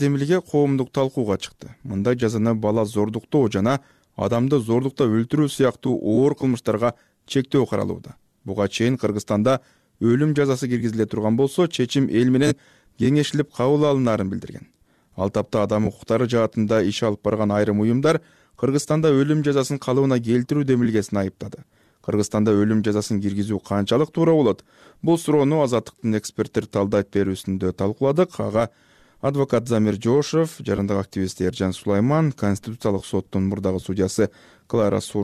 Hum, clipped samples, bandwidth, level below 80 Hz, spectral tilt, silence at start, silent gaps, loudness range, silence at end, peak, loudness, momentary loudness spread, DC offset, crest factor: none; under 0.1%; 14.5 kHz; -54 dBFS; -6.5 dB/octave; 0 s; none; 2 LU; 0 s; -8 dBFS; -21 LUFS; 7 LU; under 0.1%; 14 dB